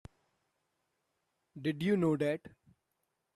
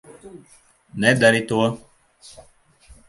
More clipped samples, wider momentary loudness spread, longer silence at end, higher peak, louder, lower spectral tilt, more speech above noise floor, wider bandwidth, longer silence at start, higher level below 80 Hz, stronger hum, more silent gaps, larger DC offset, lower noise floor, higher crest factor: neither; second, 9 LU vs 21 LU; second, 0.85 s vs 1.3 s; second, -20 dBFS vs -2 dBFS; second, -33 LUFS vs -18 LUFS; first, -7.5 dB/octave vs -5 dB/octave; first, 51 dB vs 34 dB; first, 13.5 kHz vs 11.5 kHz; first, 1.55 s vs 0.25 s; second, -72 dBFS vs -56 dBFS; neither; neither; neither; first, -83 dBFS vs -53 dBFS; about the same, 18 dB vs 22 dB